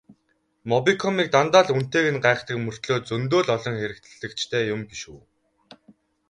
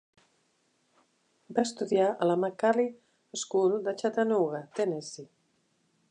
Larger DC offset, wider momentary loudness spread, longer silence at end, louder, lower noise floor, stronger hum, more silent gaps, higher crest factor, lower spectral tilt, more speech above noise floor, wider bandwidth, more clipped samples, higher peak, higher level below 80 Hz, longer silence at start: neither; first, 17 LU vs 11 LU; first, 1.1 s vs 0.85 s; first, -22 LUFS vs -29 LUFS; about the same, -69 dBFS vs -72 dBFS; neither; neither; about the same, 22 dB vs 18 dB; about the same, -5 dB/octave vs -5 dB/octave; about the same, 47 dB vs 44 dB; about the same, 10.5 kHz vs 10.5 kHz; neither; first, -2 dBFS vs -12 dBFS; first, -60 dBFS vs -86 dBFS; second, 0.1 s vs 1.5 s